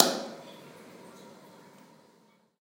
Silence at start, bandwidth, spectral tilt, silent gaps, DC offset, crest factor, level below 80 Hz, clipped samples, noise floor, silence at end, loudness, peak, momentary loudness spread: 0 s; 16 kHz; -2.5 dB/octave; none; under 0.1%; 34 dB; under -90 dBFS; under 0.1%; -64 dBFS; 1.3 s; -30 LUFS; 0 dBFS; 19 LU